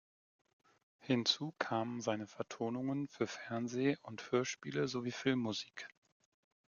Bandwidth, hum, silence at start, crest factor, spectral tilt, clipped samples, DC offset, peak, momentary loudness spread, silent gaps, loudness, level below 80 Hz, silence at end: 7.4 kHz; none; 1.05 s; 22 dB; -4.5 dB/octave; under 0.1%; under 0.1%; -18 dBFS; 9 LU; none; -38 LUFS; -80 dBFS; 0.8 s